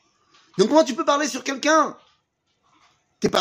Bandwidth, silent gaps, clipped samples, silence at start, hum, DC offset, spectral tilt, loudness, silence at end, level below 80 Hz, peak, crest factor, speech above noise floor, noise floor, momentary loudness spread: 15.5 kHz; none; under 0.1%; 0.55 s; none; under 0.1%; -3.5 dB/octave; -20 LUFS; 0 s; -62 dBFS; -4 dBFS; 20 dB; 51 dB; -71 dBFS; 9 LU